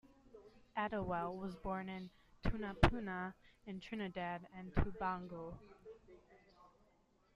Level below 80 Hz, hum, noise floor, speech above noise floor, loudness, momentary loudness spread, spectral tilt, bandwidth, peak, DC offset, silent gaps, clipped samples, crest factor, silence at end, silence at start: -50 dBFS; none; -74 dBFS; 33 dB; -42 LUFS; 24 LU; -7.5 dB/octave; 11 kHz; -12 dBFS; under 0.1%; none; under 0.1%; 30 dB; 0.65 s; 0.05 s